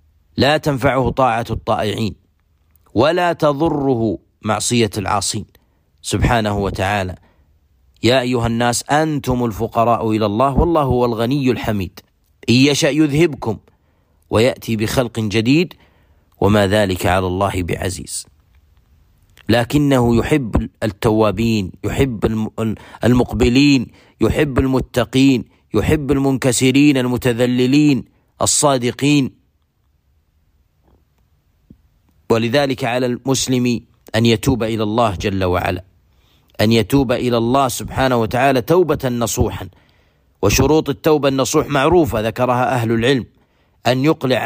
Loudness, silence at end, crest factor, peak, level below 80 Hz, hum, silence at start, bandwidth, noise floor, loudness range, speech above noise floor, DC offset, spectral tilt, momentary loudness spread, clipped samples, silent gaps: -17 LUFS; 0 s; 14 dB; -2 dBFS; -36 dBFS; none; 0.35 s; 15.5 kHz; -61 dBFS; 4 LU; 46 dB; under 0.1%; -5 dB/octave; 8 LU; under 0.1%; none